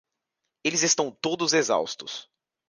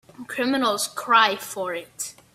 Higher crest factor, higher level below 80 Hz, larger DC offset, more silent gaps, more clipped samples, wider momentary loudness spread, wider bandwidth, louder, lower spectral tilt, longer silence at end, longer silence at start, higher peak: about the same, 20 dB vs 22 dB; about the same, -74 dBFS vs -70 dBFS; neither; neither; neither; about the same, 13 LU vs 15 LU; second, 11 kHz vs 16 kHz; about the same, -24 LUFS vs -22 LUFS; about the same, -2 dB/octave vs -1.5 dB/octave; first, 0.45 s vs 0.25 s; first, 0.65 s vs 0.2 s; second, -8 dBFS vs -2 dBFS